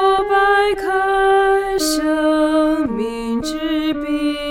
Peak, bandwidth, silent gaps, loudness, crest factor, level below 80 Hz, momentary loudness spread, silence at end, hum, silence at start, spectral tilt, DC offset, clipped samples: -4 dBFS; 16.5 kHz; none; -17 LUFS; 12 dB; -40 dBFS; 7 LU; 0 s; none; 0 s; -3.5 dB/octave; under 0.1%; under 0.1%